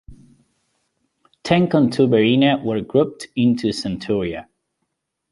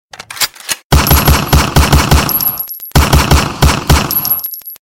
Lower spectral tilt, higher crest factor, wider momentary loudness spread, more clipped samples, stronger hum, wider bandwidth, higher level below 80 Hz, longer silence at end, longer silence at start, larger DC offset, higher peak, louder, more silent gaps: first, -6.5 dB/octave vs -4 dB/octave; first, 18 dB vs 10 dB; first, 10 LU vs 7 LU; neither; neither; second, 11.5 kHz vs 17.5 kHz; second, -52 dBFS vs -16 dBFS; first, 0.9 s vs 0.05 s; second, 0.1 s vs 0.3 s; neither; about the same, -2 dBFS vs 0 dBFS; second, -18 LUFS vs -11 LUFS; second, none vs 0.84-0.90 s